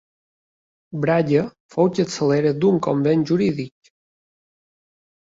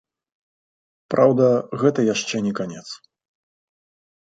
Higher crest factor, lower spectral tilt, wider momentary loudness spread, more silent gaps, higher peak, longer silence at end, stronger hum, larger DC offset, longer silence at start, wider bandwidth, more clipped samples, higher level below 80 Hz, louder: about the same, 16 dB vs 20 dB; first, -7 dB/octave vs -5.5 dB/octave; second, 10 LU vs 19 LU; first, 1.60-1.69 s vs none; about the same, -4 dBFS vs -2 dBFS; first, 1.55 s vs 1.4 s; neither; neither; second, 0.9 s vs 1.1 s; second, 7.8 kHz vs 9.2 kHz; neither; first, -60 dBFS vs -66 dBFS; about the same, -20 LUFS vs -20 LUFS